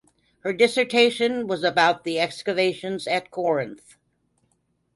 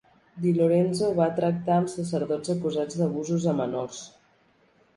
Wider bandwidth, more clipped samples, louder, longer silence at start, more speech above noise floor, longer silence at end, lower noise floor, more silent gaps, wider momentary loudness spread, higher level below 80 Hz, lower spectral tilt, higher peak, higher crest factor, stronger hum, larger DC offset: about the same, 11.5 kHz vs 11.5 kHz; neither; first, -22 LUFS vs -26 LUFS; about the same, 0.45 s vs 0.35 s; first, 47 dB vs 38 dB; first, 1.2 s vs 0.9 s; first, -70 dBFS vs -63 dBFS; neither; about the same, 10 LU vs 8 LU; about the same, -68 dBFS vs -66 dBFS; second, -4 dB/octave vs -7 dB/octave; first, -4 dBFS vs -8 dBFS; about the same, 20 dB vs 18 dB; first, 60 Hz at -55 dBFS vs none; neither